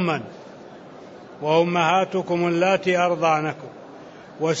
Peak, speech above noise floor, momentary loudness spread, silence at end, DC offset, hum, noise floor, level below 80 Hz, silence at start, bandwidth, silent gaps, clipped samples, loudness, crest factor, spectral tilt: -6 dBFS; 21 dB; 23 LU; 0 s; under 0.1%; none; -42 dBFS; -70 dBFS; 0 s; 8 kHz; none; under 0.1%; -21 LUFS; 18 dB; -5.5 dB/octave